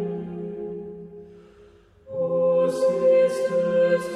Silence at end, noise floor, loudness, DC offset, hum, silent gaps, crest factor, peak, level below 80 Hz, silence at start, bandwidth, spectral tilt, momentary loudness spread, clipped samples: 0 s; -52 dBFS; -22 LUFS; under 0.1%; none; none; 14 dB; -10 dBFS; -62 dBFS; 0 s; 11.5 kHz; -6.5 dB/octave; 18 LU; under 0.1%